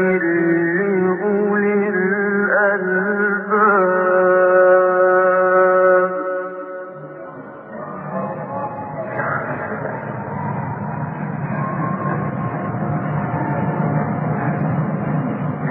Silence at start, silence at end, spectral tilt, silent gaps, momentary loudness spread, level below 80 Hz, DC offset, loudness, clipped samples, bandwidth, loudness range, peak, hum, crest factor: 0 s; 0 s; -13.5 dB/octave; none; 14 LU; -58 dBFS; under 0.1%; -18 LUFS; under 0.1%; 3.1 kHz; 12 LU; -2 dBFS; none; 16 dB